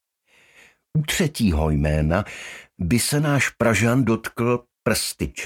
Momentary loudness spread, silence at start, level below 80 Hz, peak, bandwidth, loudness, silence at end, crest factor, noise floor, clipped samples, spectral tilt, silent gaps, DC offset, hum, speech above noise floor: 8 LU; 0.95 s; -34 dBFS; -4 dBFS; 17 kHz; -21 LUFS; 0 s; 18 dB; -59 dBFS; under 0.1%; -5 dB/octave; none; under 0.1%; none; 38 dB